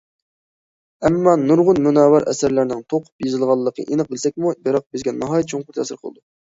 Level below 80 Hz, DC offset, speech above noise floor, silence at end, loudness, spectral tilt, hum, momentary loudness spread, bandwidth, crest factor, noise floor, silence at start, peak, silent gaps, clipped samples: -54 dBFS; under 0.1%; over 72 dB; 0.5 s; -18 LUFS; -6.5 dB/octave; none; 11 LU; 8 kHz; 18 dB; under -90 dBFS; 1 s; -2 dBFS; 3.12-3.19 s, 4.86-4.90 s; under 0.1%